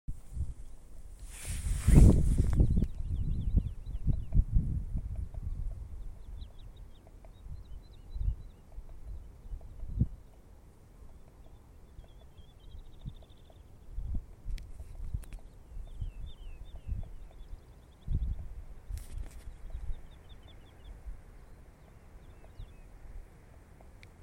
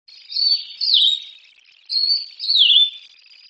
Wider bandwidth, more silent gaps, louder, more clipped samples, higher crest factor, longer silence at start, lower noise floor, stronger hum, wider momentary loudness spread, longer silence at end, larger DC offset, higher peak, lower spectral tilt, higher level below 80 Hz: first, 16 kHz vs 8.8 kHz; neither; second, -34 LUFS vs -15 LUFS; neither; first, 26 dB vs 18 dB; second, 0.1 s vs 0.3 s; first, -55 dBFS vs -51 dBFS; neither; first, 25 LU vs 10 LU; second, 0 s vs 0.5 s; neither; second, -8 dBFS vs -2 dBFS; first, -7.5 dB/octave vs 7.5 dB/octave; first, -36 dBFS vs under -90 dBFS